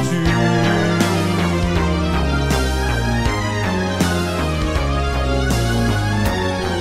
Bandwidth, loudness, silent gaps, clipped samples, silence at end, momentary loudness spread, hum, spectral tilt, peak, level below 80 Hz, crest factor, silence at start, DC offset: 16 kHz; -18 LUFS; none; under 0.1%; 0 s; 4 LU; none; -5.5 dB/octave; -4 dBFS; -24 dBFS; 14 dB; 0 s; under 0.1%